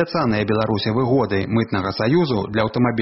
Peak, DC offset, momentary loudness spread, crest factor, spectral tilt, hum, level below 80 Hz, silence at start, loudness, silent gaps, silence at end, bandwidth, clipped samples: -4 dBFS; under 0.1%; 2 LU; 16 dB; -5.5 dB/octave; none; -48 dBFS; 0 s; -20 LUFS; none; 0 s; 6 kHz; under 0.1%